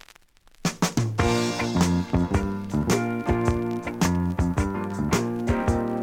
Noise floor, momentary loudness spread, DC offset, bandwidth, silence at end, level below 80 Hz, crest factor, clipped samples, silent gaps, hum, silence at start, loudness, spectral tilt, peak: -54 dBFS; 5 LU; under 0.1%; 16.5 kHz; 0 s; -36 dBFS; 16 dB; under 0.1%; none; none; 0.65 s; -25 LUFS; -5.5 dB/octave; -8 dBFS